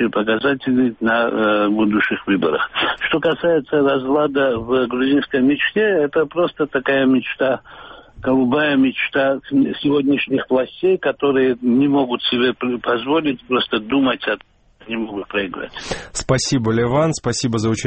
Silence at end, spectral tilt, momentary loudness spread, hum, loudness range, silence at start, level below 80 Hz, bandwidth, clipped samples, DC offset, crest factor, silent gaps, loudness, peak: 0 s; -5 dB/octave; 7 LU; none; 4 LU; 0 s; -48 dBFS; 8.4 kHz; under 0.1%; under 0.1%; 14 dB; none; -18 LUFS; -4 dBFS